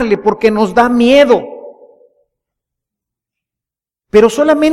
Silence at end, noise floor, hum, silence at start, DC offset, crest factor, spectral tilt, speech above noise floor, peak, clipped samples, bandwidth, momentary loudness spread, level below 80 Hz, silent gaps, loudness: 0 s; -87 dBFS; none; 0 s; under 0.1%; 12 dB; -5 dB/octave; 78 dB; 0 dBFS; under 0.1%; 13 kHz; 5 LU; -44 dBFS; none; -10 LUFS